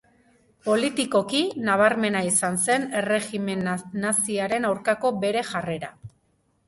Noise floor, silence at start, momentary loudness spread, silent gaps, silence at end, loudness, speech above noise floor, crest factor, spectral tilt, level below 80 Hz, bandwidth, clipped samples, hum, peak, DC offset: -67 dBFS; 0.65 s; 8 LU; none; 0.6 s; -24 LUFS; 44 dB; 20 dB; -3.5 dB/octave; -64 dBFS; 12 kHz; under 0.1%; none; -4 dBFS; under 0.1%